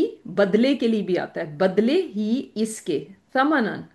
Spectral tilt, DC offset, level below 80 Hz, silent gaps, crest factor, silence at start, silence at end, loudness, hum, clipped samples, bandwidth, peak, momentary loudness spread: -5.5 dB/octave; under 0.1%; -70 dBFS; none; 16 dB; 0 s; 0.1 s; -23 LUFS; none; under 0.1%; 12.5 kHz; -6 dBFS; 9 LU